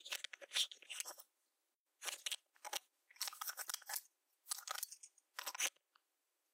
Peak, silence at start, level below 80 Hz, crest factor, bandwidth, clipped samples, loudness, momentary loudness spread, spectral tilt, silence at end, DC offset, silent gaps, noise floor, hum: -22 dBFS; 0 s; under -90 dBFS; 26 dB; 16.5 kHz; under 0.1%; -44 LUFS; 9 LU; 5 dB/octave; 0.85 s; under 0.1%; 1.75-1.86 s; -88 dBFS; none